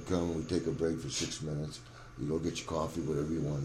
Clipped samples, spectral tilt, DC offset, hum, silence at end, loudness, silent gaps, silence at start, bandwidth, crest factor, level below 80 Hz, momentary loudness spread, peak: under 0.1%; -5.5 dB/octave; under 0.1%; none; 0 s; -35 LUFS; none; 0 s; 13.5 kHz; 16 dB; -52 dBFS; 8 LU; -18 dBFS